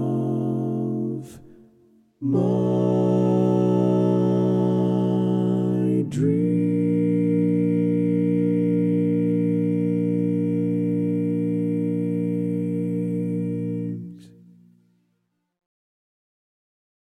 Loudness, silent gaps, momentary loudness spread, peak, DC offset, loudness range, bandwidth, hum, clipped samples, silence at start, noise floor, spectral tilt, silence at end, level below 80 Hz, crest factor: -22 LUFS; none; 6 LU; -8 dBFS; under 0.1%; 8 LU; 9.4 kHz; none; under 0.1%; 0 s; -73 dBFS; -10 dB/octave; 2.85 s; -68 dBFS; 14 dB